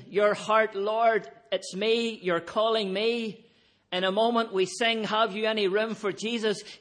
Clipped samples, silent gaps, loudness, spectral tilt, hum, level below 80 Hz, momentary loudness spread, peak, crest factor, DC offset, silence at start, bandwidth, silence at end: under 0.1%; none; -27 LUFS; -4 dB/octave; none; -76 dBFS; 7 LU; -10 dBFS; 18 dB; under 0.1%; 0 s; 10 kHz; 0.05 s